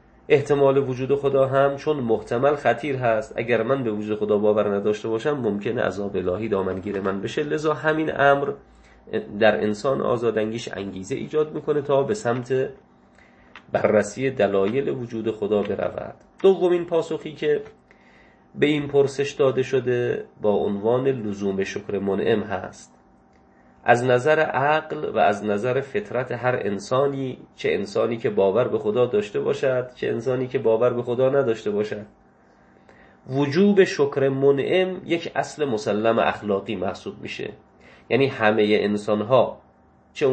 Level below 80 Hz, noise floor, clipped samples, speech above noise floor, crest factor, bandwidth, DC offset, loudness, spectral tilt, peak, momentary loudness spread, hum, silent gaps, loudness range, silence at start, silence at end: -58 dBFS; -55 dBFS; under 0.1%; 34 dB; 22 dB; 8.8 kHz; under 0.1%; -22 LUFS; -6.5 dB/octave; -2 dBFS; 9 LU; none; none; 3 LU; 0.3 s; 0 s